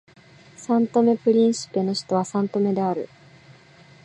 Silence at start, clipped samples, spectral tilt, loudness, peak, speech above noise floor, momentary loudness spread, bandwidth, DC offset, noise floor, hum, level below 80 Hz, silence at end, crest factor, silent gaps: 0.6 s; under 0.1%; -6 dB/octave; -22 LUFS; -6 dBFS; 29 dB; 9 LU; 10.5 kHz; under 0.1%; -50 dBFS; none; -70 dBFS; 1 s; 16 dB; none